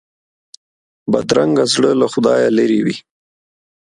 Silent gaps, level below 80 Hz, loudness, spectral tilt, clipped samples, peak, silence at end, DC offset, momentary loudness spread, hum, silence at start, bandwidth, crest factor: none; -56 dBFS; -14 LUFS; -5 dB/octave; under 0.1%; 0 dBFS; 0.8 s; under 0.1%; 8 LU; none; 1.05 s; 11.5 kHz; 16 dB